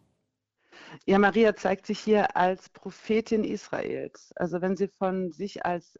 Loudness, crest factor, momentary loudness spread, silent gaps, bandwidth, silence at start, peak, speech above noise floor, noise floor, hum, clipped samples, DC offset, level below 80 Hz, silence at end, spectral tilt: -27 LUFS; 16 dB; 14 LU; none; 7.8 kHz; 0.8 s; -10 dBFS; 51 dB; -78 dBFS; none; under 0.1%; under 0.1%; -60 dBFS; 0.2 s; -6.5 dB/octave